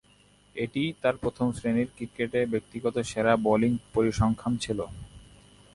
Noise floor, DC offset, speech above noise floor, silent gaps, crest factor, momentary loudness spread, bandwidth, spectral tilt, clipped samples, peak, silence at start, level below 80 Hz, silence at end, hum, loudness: -60 dBFS; under 0.1%; 33 dB; none; 20 dB; 10 LU; 11.5 kHz; -6 dB/octave; under 0.1%; -8 dBFS; 0.55 s; -50 dBFS; 0.55 s; 50 Hz at -50 dBFS; -28 LUFS